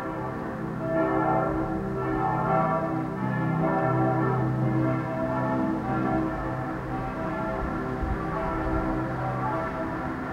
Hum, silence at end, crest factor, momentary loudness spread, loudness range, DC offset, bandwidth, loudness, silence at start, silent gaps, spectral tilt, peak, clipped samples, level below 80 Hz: none; 0 s; 14 dB; 7 LU; 4 LU; under 0.1%; 8.8 kHz; -27 LUFS; 0 s; none; -9 dB/octave; -12 dBFS; under 0.1%; -42 dBFS